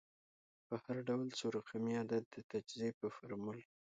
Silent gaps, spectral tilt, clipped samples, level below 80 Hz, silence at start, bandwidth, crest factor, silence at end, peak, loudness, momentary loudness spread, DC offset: 2.26-2.31 s, 2.44-2.49 s, 2.94-3.01 s; -5.5 dB/octave; under 0.1%; -82 dBFS; 0.7 s; 9 kHz; 16 dB; 0.35 s; -26 dBFS; -43 LUFS; 8 LU; under 0.1%